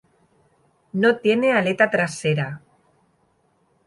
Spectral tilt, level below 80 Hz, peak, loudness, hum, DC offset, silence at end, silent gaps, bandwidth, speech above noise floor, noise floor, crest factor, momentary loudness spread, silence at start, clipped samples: -5.5 dB/octave; -66 dBFS; -4 dBFS; -20 LUFS; none; under 0.1%; 1.3 s; none; 11.5 kHz; 45 dB; -64 dBFS; 20 dB; 13 LU; 0.95 s; under 0.1%